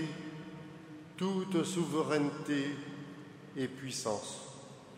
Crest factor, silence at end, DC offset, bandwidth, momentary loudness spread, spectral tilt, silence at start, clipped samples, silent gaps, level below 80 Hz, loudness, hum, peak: 18 dB; 0 s; under 0.1%; 15.5 kHz; 17 LU; -5 dB/octave; 0 s; under 0.1%; none; -78 dBFS; -36 LUFS; none; -18 dBFS